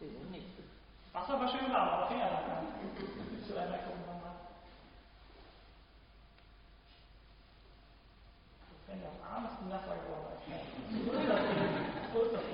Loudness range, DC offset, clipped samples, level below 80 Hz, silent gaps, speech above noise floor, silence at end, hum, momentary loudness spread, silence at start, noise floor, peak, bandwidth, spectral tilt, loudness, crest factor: 24 LU; under 0.1%; under 0.1%; -60 dBFS; none; 23 dB; 0 s; none; 26 LU; 0 s; -60 dBFS; -20 dBFS; 5.4 kHz; -9 dB/octave; -38 LUFS; 20 dB